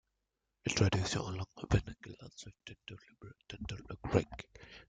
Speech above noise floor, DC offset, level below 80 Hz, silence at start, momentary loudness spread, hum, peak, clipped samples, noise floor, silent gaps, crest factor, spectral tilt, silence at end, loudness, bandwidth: 49 dB; under 0.1%; -52 dBFS; 0.65 s; 21 LU; none; -12 dBFS; under 0.1%; -86 dBFS; none; 26 dB; -5 dB/octave; 0.1 s; -36 LUFS; 9.4 kHz